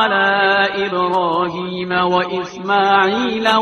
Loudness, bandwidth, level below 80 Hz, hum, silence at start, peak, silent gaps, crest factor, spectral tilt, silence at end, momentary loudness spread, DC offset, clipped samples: -16 LUFS; 12 kHz; -56 dBFS; none; 0 s; 0 dBFS; none; 16 dB; -5 dB/octave; 0 s; 8 LU; under 0.1%; under 0.1%